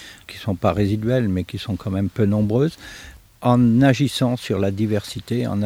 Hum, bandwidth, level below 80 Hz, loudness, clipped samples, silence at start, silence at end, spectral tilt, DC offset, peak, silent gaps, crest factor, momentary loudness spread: none; 16 kHz; -48 dBFS; -20 LUFS; under 0.1%; 0 s; 0 s; -7 dB/octave; under 0.1%; -2 dBFS; none; 18 dB; 12 LU